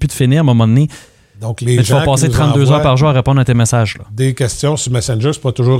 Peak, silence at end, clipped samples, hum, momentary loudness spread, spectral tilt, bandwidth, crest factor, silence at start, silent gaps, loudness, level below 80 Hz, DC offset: 0 dBFS; 0 s; under 0.1%; none; 7 LU; -6 dB/octave; 14.5 kHz; 12 dB; 0 s; none; -12 LUFS; -34 dBFS; under 0.1%